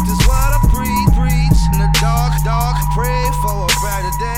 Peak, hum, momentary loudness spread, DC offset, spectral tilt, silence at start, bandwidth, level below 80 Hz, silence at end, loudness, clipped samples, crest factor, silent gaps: 0 dBFS; 50 Hz at -25 dBFS; 3 LU; 3%; -5 dB/octave; 0 s; 16.5 kHz; -16 dBFS; 0 s; -15 LUFS; under 0.1%; 14 dB; none